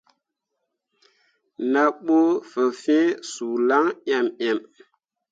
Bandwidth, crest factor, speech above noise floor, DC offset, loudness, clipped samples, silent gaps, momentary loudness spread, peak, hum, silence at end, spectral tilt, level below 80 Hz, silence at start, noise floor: 9.2 kHz; 18 dB; 58 dB; under 0.1%; -22 LUFS; under 0.1%; none; 8 LU; -6 dBFS; none; 0.7 s; -4 dB/octave; -80 dBFS; 1.6 s; -80 dBFS